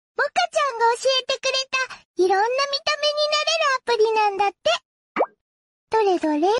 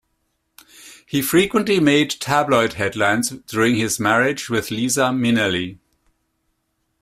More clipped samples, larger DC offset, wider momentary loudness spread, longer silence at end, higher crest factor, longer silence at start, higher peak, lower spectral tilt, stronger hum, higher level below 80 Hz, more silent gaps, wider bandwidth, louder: neither; neither; about the same, 7 LU vs 7 LU; second, 0 s vs 1.25 s; second, 12 dB vs 18 dB; second, 0.2 s vs 0.8 s; second, -10 dBFS vs -2 dBFS; second, -1 dB/octave vs -4 dB/octave; neither; second, -68 dBFS vs -54 dBFS; first, 2.05-2.14 s, 4.85-5.15 s, 5.41-5.87 s vs none; second, 11.5 kHz vs 16 kHz; second, -21 LUFS vs -18 LUFS